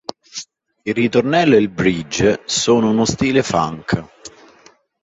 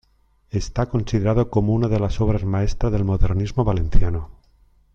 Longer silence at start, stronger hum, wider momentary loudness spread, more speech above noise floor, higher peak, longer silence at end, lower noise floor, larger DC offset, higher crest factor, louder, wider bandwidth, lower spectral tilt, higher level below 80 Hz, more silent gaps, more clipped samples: second, 0.1 s vs 0.55 s; neither; first, 16 LU vs 7 LU; second, 35 dB vs 41 dB; about the same, -2 dBFS vs -2 dBFS; about the same, 0.75 s vs 0.65 s; second, -50 dBFS vs -60 dBFS; neither; about the same, 16 dB vs 18 dB; first, -16 LUFS vs -22 LUFS; first, 8 kHz vs 7.2 kHz; second, -4.5 dB/octave vs -8 dB/octave; second, -46 dBFS vs -26 dBFS; neither; neither